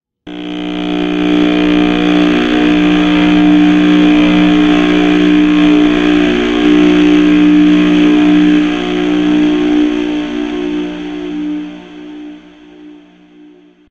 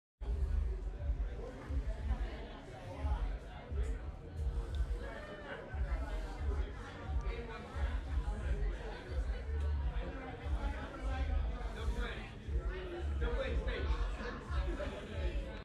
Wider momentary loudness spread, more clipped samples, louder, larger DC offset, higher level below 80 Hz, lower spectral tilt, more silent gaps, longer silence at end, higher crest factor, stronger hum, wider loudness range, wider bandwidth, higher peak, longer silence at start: first, 13 LU vs 7 LU; neither; first, -10 LUFS vs -41 LUFS; neither; about the same, -34 dBFS vs -38 dBFS; about the same, -6.5 dB/octave vs -7 dB/octave; neither; first, 1 s vs 0 s; about the same, 10 dB vs 14 dB; first, 60 Hz at -20 dBFS vs none; first, 10 LU vs 2 LU; second, 7.4 kHz vs 9.6 kHz; first, 0 dBFS vs -24 dBFS; about the same, 0.25 s vs 0.2 s